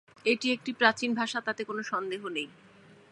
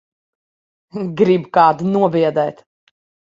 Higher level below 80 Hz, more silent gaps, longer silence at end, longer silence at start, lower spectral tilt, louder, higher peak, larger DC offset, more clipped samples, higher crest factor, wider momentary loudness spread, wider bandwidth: second, -78 dBFS vs -62 dBFS; neither; about the same, 0.65 s vs 0.75 s; second, 0.25 s vs 0.95 s; second, -3 dB/octave vs -8 dB/octave; second, -29 LUFS vs -16 LUFS; second, -6 dBFS vs 0 dBFS; neither; neither; first, 24 dB vs 18 dB; second, 10 LU vs 13 LU; first, 11 kHz vs 7.6 kHz